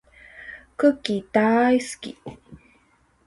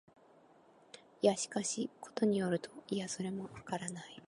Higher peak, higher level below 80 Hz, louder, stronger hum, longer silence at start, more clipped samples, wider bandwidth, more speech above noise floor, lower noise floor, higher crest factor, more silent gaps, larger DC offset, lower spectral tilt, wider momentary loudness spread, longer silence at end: first, -6 dBFS vs -16 dBFS; first, -60 dBFS vs -76 dBFS; first, -21 LUFS vs -37 LUFS; neither; second, 0.35 s vs 0.95 s; neither; about the same, 11.5 kHz vs 11.5 kHz; first, 40 dB vs 28 dB; about the same, -62 dBFS vs -64 dBFS; about the same, 20 dB vs 22 dB; neither; neither; about the same, -5 dB/octave vs -4.5 dB/octave; first, 22 LU vs 12 LU; first, 0.7 s vs 0 s